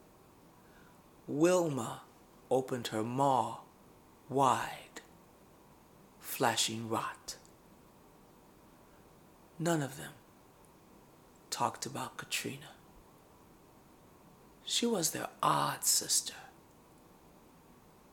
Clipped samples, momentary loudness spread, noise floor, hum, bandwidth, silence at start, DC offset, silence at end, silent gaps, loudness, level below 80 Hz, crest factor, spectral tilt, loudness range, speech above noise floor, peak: under 0.1%; 20 LU; -60 dBFS; none; 19 kHz; 1.25 s; under 0.1%; 1.65 s; none; -33 LUFS; -72 dBFS; 24 dB; -3 dB/octave; 9 LU; 27 dB; -14 dBFS